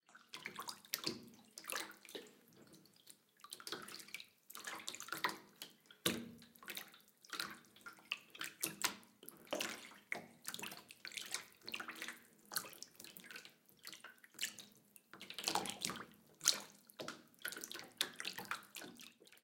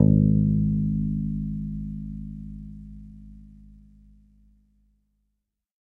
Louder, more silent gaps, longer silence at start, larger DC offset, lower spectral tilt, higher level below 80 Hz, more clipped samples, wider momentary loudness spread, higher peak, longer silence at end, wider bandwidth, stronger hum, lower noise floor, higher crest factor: second, -45 LUFS vs -25 LUFS; neither; about the same, 0.1 s vs 0 s; neither; second, -1 dB/octave vs -14 dB/octave; second, -88 dBFS vs -38 dBFS; neither; second, 18 LU vs 25 LU; second, -10 dBFS vs -4 dBFS; second, 0.05 s vs 2.55 s; first, 17 kHz vs 1 kHz; neither; second, -66 dBFS vs -79 dBFS; first, 38 dB vs 22 dB